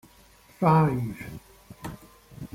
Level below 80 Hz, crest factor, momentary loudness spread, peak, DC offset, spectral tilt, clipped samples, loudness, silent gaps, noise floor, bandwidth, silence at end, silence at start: -54 dBFS; 20 dB; 24 LU; -8 dBFS; under 0.1%; -8.5 dB/octave; under 0.1%; -24 LUFS; none; -55 dBFS; 16 kHz; 0.1 s; 0.6 s